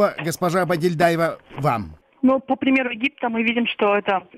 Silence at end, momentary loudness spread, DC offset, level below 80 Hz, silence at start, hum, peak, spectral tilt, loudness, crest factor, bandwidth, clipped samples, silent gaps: 0.15 s; 5 LU; under 0.1%; -56 dBFS; 0 s; none; -6 dBFS; -5.5 dB/octave; -21 LUFS; 14 dB; 16 kHz; under 0.1%; none